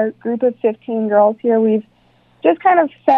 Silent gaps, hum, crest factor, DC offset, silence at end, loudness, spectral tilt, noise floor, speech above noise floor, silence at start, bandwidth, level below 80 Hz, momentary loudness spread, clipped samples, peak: none; none; 16 dB; under 0.1%; 0 s; -16 LUFS; -9 dB/octave; -54 dBFS; 39 dB; 0 s; 5 kHz; -68 dBFS; 7 LU; under 0.1%; 0 dBFS